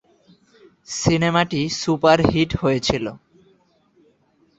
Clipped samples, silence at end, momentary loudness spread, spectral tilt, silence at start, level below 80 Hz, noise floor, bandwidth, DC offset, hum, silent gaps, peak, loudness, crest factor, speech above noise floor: under 0.1%; 1.45 s; 9 LU; -5 dB/octave; 0.9 s; -44 dBFS; -60 dBFS; 8.2 kHz; under 0.1%; none; none; 0 dBFS; -19 LUFS; 20 dB; 41 dB